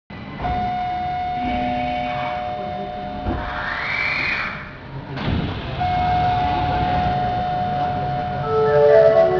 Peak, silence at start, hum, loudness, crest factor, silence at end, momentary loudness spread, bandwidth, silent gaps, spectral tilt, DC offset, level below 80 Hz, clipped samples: -2 dBFS; 0.1 s; none; -21 LUFS; 18 dB; 0 s; 11 LU; 5.4 kHz; none; -7.5 dB/octave; under 0.1%; -36 dBFS; under 0.1%